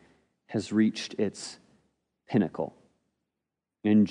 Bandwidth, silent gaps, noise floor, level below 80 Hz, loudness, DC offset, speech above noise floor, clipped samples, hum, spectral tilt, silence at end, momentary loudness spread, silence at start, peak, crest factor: 10.5 kHz; none; -87 dBFS; -74 dBFS; -29 LUFS; under 0.1%; 61 dB; under 0.1%; none; -6.5 dB/octave; 0 s; 12 LU; 0.5 s; -12 dBFS; 18 dB